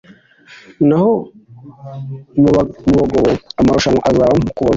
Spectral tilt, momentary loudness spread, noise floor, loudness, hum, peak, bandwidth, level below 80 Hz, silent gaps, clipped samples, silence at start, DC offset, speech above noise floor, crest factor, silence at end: -7 dB/octave; 16 LU; -43 dBFS; -14 LUFS; none; -2 dBFS; 7.8 kHz; -36 dBFS; none; under 0.1%; 0.5 s; under 0.1%; 30 dB; 12 dB; 0 s